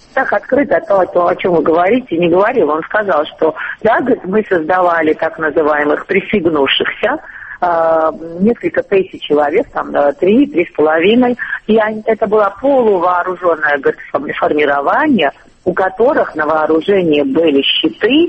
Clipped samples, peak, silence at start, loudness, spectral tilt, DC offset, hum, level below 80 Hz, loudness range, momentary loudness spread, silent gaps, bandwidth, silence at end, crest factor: under 0.1%; 0 dBFS; 0.15 s; -13 LUFS; -7 dB/octave; under 0.1%; none; -48 dBFS; 2 LU; 5 LU; none; 8 kHz; 0 s; 12 dB